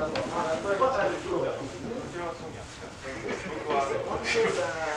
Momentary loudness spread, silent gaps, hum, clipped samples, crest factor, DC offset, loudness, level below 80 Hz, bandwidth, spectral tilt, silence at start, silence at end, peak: 13 LU; none; none; under 0.1%; 18 dB; under 0.1%; -30 LUFS; -54 dBFS; 12 kHz; -4.5 dB/octave; 0 s; 0 s; -12 dBFS